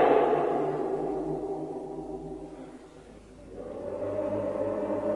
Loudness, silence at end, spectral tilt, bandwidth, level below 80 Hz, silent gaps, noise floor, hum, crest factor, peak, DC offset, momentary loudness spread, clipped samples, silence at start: -31 LUFS; 0 s; -7.5 dB/octave; 11 kHz; -56 dBFS; none; -49 dBFS; none; 20 dB; -10 dBFS; under 0.1%; 21 LU; under 0.1%; 0 s